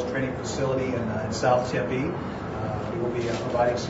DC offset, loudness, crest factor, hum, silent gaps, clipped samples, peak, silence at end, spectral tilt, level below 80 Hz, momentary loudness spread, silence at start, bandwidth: under 0.1%; -27 LUFS; 16 dB; none; none; under 0.1%; -10 dBFS; 0 s; -6 dB/octave; -48 dBFS; 7 LU; 0 s; 8 kHz